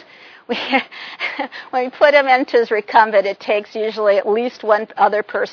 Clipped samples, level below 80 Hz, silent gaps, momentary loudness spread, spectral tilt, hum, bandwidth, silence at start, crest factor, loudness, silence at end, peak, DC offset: under 0.1%; -74 dBFS; none; 11 LU; -4.5 dB/octave; none; 5.4 kHz; 0.5 s; 18 dB; -17 LUFS; 0 s; 0 dBFS; under 0.1%